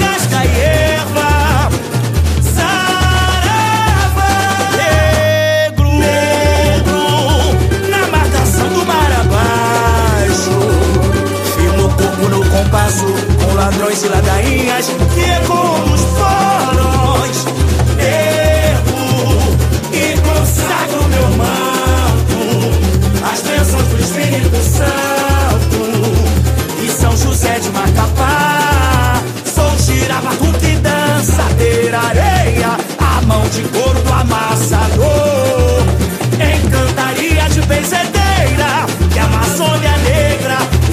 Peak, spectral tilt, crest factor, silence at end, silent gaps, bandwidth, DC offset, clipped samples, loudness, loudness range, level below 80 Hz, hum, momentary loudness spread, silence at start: 0 dBFS; -5 dB/octave; 12 dB; 0 s; none; 15.5 kHz; under 0.1%; under 0.1%; -12 LUFS; 1 LU; -18 dBFS; none; 3 LU; 0 s